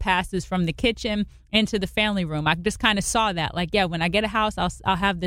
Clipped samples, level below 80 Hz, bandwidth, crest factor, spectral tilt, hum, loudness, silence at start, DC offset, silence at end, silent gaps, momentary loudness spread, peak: under 0.1%; -40 dBFS; 16 kHz; 20 dB; -4 dB/octave; none; -23 LUFS; 0 s; under 0.1%; 0 s; none; 5 LU; -4 dBFS